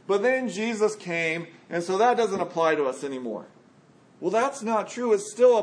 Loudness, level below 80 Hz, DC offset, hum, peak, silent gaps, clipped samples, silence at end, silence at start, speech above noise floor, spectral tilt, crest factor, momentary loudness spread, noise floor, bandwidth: -25 LUFS; -82 dBFS; under 0.1%; none; -8 dBFS; none; under 0.1%; 0 s; 0.1 s; 32 dB; -4.5 dB/octave; 16 dB; 11 LU; -56 dBFS; 10.5 kHz